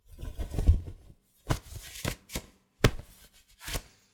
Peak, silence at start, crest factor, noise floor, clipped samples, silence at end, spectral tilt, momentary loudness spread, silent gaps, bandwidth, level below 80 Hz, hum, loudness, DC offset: -4 dBFS; 0.15 s; 30 dB; -58 dBFS; under 0.1%; 0.3 s; -5 dB/octave; 19 LU; none; over 20 kHz; -34 dBFS; none; -33 LUFS; under 0.1%